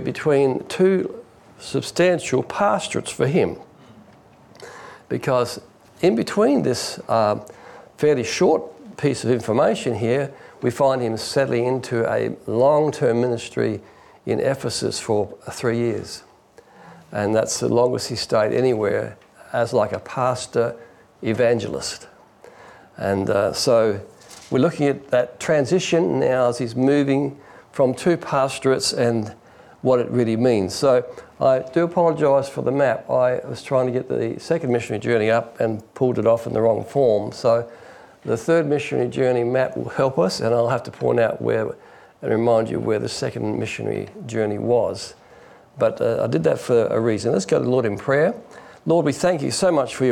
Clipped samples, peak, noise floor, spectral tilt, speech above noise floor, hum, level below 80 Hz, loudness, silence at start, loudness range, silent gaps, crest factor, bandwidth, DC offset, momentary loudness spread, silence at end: under 0.1%; -8 dBFS; -50 dBFS; -5.5 dB/octave; 30 dB; none; -60 dBFS; -21 LUFS; 0 s; 4 LU; none; 14 dB; 14 kHz; under 0.1%; 9 LU; 0 s